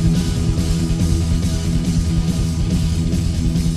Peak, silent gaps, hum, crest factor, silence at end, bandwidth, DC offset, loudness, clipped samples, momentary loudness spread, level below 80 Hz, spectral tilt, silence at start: -4 dBFS; none; none; 12 dB; 0 s; 13.5 kHz; 0.8%; -19 LUFS; under 0.1%; 1 LU; -22 dBFS; -6.5 dB/octave; 0 s